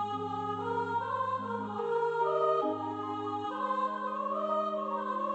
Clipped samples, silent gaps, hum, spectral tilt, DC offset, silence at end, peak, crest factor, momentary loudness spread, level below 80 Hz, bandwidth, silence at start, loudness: under 0.1%; none; none; -7 dB/octave; under 0.1%; 0 s; -18 dBFS; 14 dB; 6 LU; -80 dBFS; 8.4 kHz; 0 s; -33 LUFS